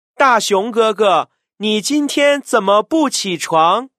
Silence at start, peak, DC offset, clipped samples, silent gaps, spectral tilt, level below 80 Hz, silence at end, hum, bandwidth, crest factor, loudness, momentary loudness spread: 0.2 s; 0 dBFS; under 0.1%; under 0.1%; none; -3 dB/octave; -68 dBFS; 0.1 s; none; 15.5 kHz; 14 dB; -15 LUFS; 5 LU